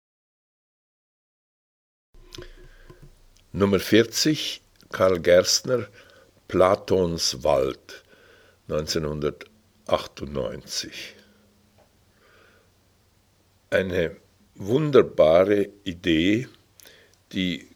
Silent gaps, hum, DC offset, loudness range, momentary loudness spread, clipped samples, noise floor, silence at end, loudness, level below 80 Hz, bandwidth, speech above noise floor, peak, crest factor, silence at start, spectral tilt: none; none; under 0.1%; 11 LU; 20 LU; under 0.1%; -62 dBFS; 0.15 s; -23 LUFS; -52 dBFS; 19.5 kHz; 40 dB; -2 dBFS; 22 dB; 2.35 s; -4.5 dB/octave